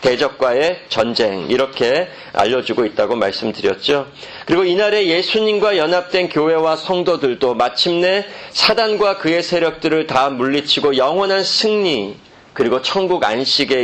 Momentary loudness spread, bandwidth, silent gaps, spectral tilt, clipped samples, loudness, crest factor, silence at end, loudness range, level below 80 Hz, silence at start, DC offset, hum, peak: 5 LU; 9 kHz; none; -4 dB/octave; under 0.1%; -16 LUFS; 16 dB; 0 s; 2 LU; -54 dBFS; 0 s; under 0.1%; none; 0 dBFS